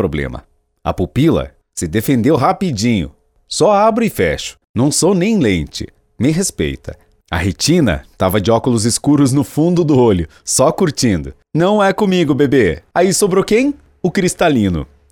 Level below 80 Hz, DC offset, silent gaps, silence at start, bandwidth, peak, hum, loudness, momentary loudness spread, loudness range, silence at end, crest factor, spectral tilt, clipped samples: -36 dBFS; under 0.1%; 4.69-4.74 s; 0 s; 19.5 kHz; 0 dBFS; none; -15 LUFS; 11 LU; 3 LU; 0.25 s; 14 dB; -5 dB/octave; under 0.1%